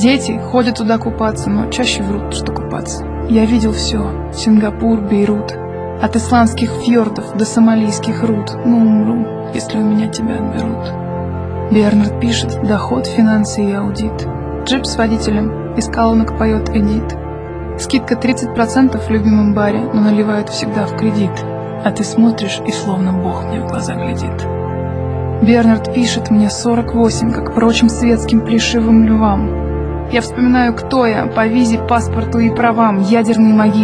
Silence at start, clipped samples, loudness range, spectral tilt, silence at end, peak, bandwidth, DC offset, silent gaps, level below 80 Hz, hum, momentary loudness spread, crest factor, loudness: 0 s; under 0.1%; 3 LU; -6 dB/octave; 0 s; 0 dBFS; 10.5 kHz; under 0.1%; none; -30 dBFS; none; 9 LU; 14 dB; -14 LUFS